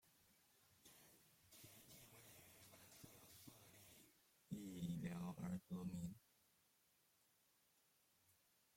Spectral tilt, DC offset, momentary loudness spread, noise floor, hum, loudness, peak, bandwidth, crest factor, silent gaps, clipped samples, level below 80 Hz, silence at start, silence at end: -6 dB/octave; under 0.1%; 18 LU; -80 dBFS; none; -55 LUFS; -36 dBFS; 16.5 kHz; 20 dB; none; under 0.1%; -80 dBFS; 0.05 s; 0.4 s